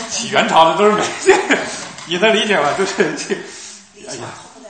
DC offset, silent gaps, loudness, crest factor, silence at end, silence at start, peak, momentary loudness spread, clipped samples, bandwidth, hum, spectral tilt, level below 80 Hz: under 0.1%; none; -15 LUFS; 16 dB; 0 s; 0 s; 0 dBFS; 19 LU; 0.1%; 11 kHz; none; -3 dB/octave; -56 dBFS